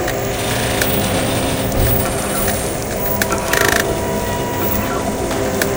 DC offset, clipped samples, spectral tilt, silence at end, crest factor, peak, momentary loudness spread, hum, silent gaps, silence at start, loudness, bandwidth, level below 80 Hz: 0.2%; under 0.1%; -4 dB/octave; 0 s; 18 dB; 0 dBFS; 5 LU; none; none; 0 s; -17 LUFS; 17.5 kHz; -30 dBFS